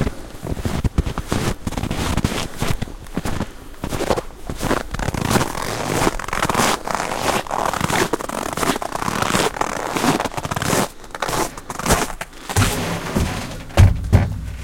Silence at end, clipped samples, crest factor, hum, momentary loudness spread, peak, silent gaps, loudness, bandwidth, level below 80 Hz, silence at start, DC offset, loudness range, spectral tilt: 0 s; under 0.1%; 20 dB; none; 9 LU; 0 dBFS; none; -21 LUFS; 17 kHz; -30 dBFS; 0 s; under 0.1%; 4 LU; -4.5 dB/octave